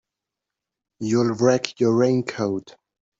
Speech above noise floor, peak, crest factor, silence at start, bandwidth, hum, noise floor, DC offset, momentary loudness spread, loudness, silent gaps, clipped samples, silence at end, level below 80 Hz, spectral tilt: 65 dB; -4 dBFS; 18 dB; 1 s; 7.8 kHz; none; -86 dBFS; under 0.1%; 9 LU; -21 LUFS; none; under 0.1%; 0.5 s; -66 dBFS; -6 dB/octave